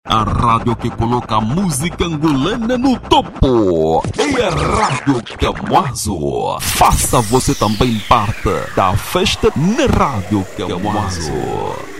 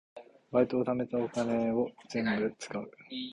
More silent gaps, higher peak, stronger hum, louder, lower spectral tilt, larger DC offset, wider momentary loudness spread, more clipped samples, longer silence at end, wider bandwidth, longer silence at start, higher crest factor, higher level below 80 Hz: neither; first, 0 dBFS vs -14 dBFS; neither; first, -15 LUFS vs -32 LUFS; about the same, -5 dB/octave vs -6 dB/octave; neither; second, 6 LU vs 11 LU; neither; about the same, 0 s vs 0 s; first, 16.5 kHz vs 11 kHz; about the same, 0.05 s vs 0.15 s; about the same, 14 dB vs 18 dB; first, -28 dBFS vs -66 dBFS